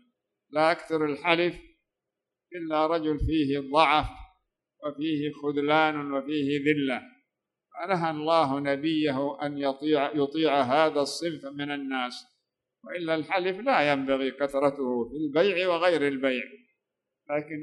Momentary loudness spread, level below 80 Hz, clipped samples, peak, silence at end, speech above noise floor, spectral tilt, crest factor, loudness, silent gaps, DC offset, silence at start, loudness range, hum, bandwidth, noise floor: 10 LU; -50 dBFS; under 0.1%; -6 dBFS; 0 s; 61 dB; -5.5 dB/octave; 22 dB; -27 LUFS; none; under 0.1%; 0.5 s; 3 LU; none; 12 kHz; -87 dBFS